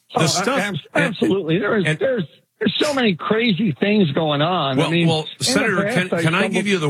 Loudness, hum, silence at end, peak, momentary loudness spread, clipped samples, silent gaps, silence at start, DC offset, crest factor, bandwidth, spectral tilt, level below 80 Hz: -19 LUFS; none; 0 s; -4 dBFS; 4 LU; under 0.1%; none; 0.1 s; under 0.1%; 16 dB; 15.5 kHz; -5 dB/octave; -66 dBFS